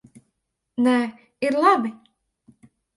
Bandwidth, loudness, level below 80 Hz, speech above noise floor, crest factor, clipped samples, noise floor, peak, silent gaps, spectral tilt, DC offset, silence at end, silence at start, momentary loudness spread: 11.5 kHz; -21 LUFS; -72 dBFS; 57 dB; 20 dB; under 0.1%; -77 dBFS; -4 dBFS; none; -5 dB/octave; under 0.1%; 1 s; 0.8 s; 13 LU